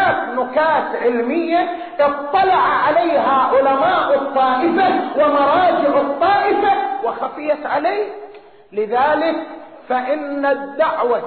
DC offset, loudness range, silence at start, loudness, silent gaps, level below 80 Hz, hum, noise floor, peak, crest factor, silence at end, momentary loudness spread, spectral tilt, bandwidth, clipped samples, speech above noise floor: 0.2%; 5 LU; 0 s; -17 LUFS; none; -56 dBFS; none; -39 dBFS; -4 dBFS; 12 dB; 0 s; 9 LU; -2 dB/octave; 4.5 kHz; under 0.1%; 23 dB